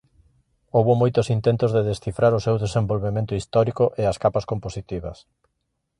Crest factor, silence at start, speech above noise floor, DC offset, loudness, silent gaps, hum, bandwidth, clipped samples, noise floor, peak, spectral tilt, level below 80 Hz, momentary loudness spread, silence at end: 18 dB; 0.75 s; 41 dB; under 0.1%; -22 LUFS; none; none; 11 kHz; under 0.1%; -63 dBFS; -4 dBFS; -7.5 dB/octave; -46 dBFS; 11 LU; 0.85 s